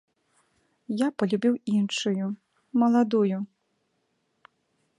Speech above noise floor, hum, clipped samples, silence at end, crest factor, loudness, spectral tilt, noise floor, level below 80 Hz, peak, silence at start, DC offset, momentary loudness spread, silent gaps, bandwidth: 50 dB; none; under 0.1%; 1.55 s; 18 dB; -26 LUFS; -6 dB/octave; -74 dBFS; -78 dBFS; -10 dBFS; 0.9 s; under 0.1%; 12 LU; none; 11 kHz